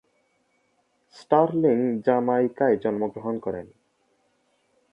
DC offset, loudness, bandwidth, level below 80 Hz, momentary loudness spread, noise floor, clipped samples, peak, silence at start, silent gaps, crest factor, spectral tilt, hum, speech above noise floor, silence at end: under 0.1%; -23 LUFS; 8.2 kHz; -66 dBFS; 9 LU; -69 dBFS; under 0.1%; -6 dBFS; 1.15 s; none; 20 dB; -9 dB/octave; none; 46 dB; 1.25 s